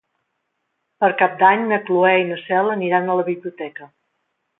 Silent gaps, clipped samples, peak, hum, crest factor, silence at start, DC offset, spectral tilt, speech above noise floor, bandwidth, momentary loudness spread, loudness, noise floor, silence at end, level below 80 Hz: none; under 0.1%; -2 dBFS; none; 18 dB; 1 s; under 0.1%; -10 dB/octave; 56 dB; 4 kHz; 13 LU; -18 LUFS; -74 dBFS; 0.75 s; -72 dBFS